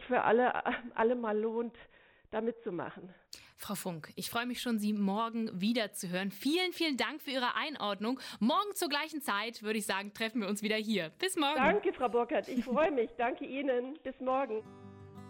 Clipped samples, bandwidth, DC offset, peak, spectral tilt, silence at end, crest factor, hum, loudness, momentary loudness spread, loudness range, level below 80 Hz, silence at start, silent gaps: under 0.1%; 17.5 kHz; under 0.1%; -16 dBFS; -4 dB/octave; 0 s; 18 dB; none; -33 LUFS; 12 LU; 5 LU; -68 dBFS; 0 s; none